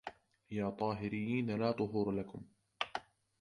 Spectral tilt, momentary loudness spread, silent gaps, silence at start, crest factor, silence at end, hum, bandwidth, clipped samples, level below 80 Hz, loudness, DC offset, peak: -7.5 dB/octave; 12 LU; none; 0.05 s; 20 dB; 0.4 s; none; 11 kHz; under 0.1%; -68 dBFS; -38 LUFS; under 0.1%; -18 dBFS